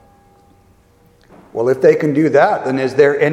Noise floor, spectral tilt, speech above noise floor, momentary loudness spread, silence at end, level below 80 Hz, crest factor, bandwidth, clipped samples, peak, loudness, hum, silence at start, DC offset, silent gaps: -51 dBFS; -7 dB/octave; 38 dB; 6 LU; 0 s; -58 dBFS; 16 dB; 11 kHz; under 0.1%; 0 dBFS; -14 LUFS; none; 1.55 s; under 0.1%; none